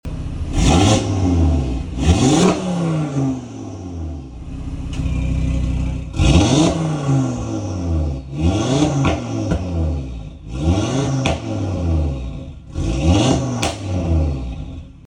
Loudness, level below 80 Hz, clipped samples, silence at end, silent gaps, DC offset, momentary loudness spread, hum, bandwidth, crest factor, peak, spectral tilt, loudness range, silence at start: -19 LUFS; -26 dBFS; under 0.1%; 0.05 s; none; under 0.1%; 16 LU; none; 11 kHz; 16 dB; -2 dBFS; -6 dB/octave; 5 LU; 0.05 s